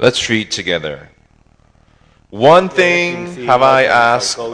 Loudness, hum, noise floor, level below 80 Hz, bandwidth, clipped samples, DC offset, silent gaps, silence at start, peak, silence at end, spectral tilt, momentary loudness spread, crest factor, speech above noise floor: -12 LUFS; none; -51 dBFS; -50 dBFS; 11 kHz; 0.5%; under 0.1%; none; 0 s; 0 dBFS; 0 s; -3.5 dB/octave; 13 LU; 14 dB; 38 dB